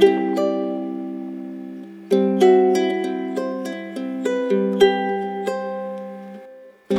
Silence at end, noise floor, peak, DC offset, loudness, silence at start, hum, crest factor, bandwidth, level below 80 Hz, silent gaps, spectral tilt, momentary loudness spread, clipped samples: 0 s; -43 dBFS; -2 dBFS; under 0.1%; -21 LUFS; 0 s; none; 18 dB; 12.5 kHz; -64 dBFS; none; -6 dB/octave; 18 LU; under 0.1%